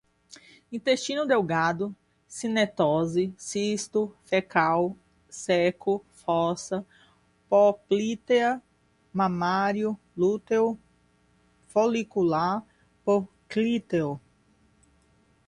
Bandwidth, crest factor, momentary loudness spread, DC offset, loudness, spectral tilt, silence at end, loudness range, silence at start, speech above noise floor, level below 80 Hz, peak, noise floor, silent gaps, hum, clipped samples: 11.5 kHz; 20 dB; 10 LU; under 0.1%; -26 LUFS; -5 dB/octave; 1.3 s; 2 LU; 0.7 s; 39 dB; -64 dBFS; -6 dBFS; -64 dBFS; none; none; under 0.1%